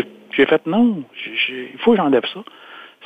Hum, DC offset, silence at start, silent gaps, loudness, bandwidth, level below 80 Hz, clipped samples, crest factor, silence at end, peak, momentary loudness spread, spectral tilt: none; under 0.1%; 0 s; none; -18 LUFS; 4.9 kHz; -60 dBFS; under 0.1%; 18 dB; 0.2 s; -2 dBFS; 16 LU; -7.5 dB/octave